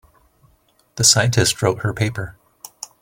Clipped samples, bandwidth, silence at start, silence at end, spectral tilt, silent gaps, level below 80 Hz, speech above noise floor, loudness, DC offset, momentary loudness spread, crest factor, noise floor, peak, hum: under 0.1%; 17 kHz; 0.95 s; 0.7 s; -3 dB/octave; none; -46 dBFS; 42 dB; -17 LUFS; under 0.1%; 22 LU; 20 dB; -59 dBFS; 0 dBFS; none